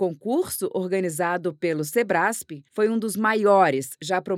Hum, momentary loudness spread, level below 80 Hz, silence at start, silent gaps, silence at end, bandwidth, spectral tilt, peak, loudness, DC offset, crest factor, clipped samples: none; 9 LU; -70 dBFS; 0 s; none; 0 s; 17 kHz; -4.5 dB/octave; -4 dBFS; -23 LUFS; under 0.1%; 20 dB; under 0.1%